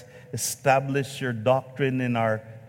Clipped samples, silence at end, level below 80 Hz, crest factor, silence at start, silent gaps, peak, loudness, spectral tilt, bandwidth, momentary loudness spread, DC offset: under 0.1%; 0 s; -66 dBFS; 20 dB; 0 s; none; -6 dBFS; -25 LUFS; -5 dB/octave; 17 kHz; 7 LU; under 0.1%